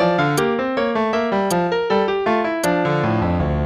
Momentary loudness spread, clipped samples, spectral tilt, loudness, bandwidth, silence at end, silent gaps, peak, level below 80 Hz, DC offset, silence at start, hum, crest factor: 2 LU; under 0.1%; -6 dB/octave; -19 LUFS; 15 kHz; 0 s; none; -6 dBFS; -38 dBFS; under 0.1%; 0 s; none; 12 dB